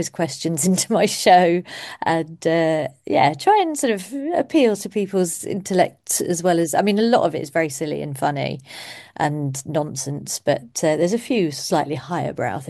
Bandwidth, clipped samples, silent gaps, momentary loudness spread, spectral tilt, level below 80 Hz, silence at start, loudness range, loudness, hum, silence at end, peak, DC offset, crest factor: 12.5 kHz; under 0.1%; none; 9 LU; -4.5 dB/octave; -64 dBFS; 0 s; 5 LU; -20 LUFS; none; 0 s; -2 dBFS; under 0.1%; 18 dB